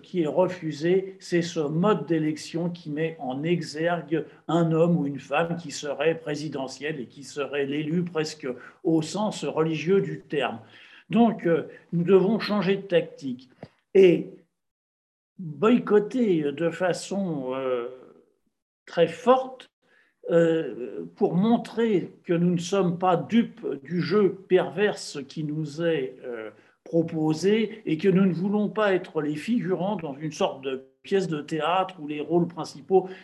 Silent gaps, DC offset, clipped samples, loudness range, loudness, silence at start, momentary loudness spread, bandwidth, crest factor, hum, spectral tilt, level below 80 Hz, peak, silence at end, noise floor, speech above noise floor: 14.71-15.36 s, 18.62-18.86 s, 19.73-19.82 s; under 0.1%; under 0.1%; 4 LU; -25 LUFS; 0.15 s; 12 LU; 12 kHz; 18 dB; none; -6.5 dB/octave; -74 dBFS; -8 dBFS; 0 s; -62 dBFS; 37 dB